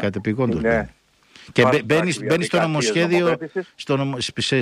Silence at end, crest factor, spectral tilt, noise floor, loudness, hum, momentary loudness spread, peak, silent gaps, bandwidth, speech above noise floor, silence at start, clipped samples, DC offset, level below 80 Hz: 0 s; 18 dB; -5 dB/octave; -50 dBFS; -20 LUFS; none; 8 LU; -2 dBFS; none; 15.5 kHz; 30 dB; 0 s; under 0.1%; under 0.1%; -48 dBFS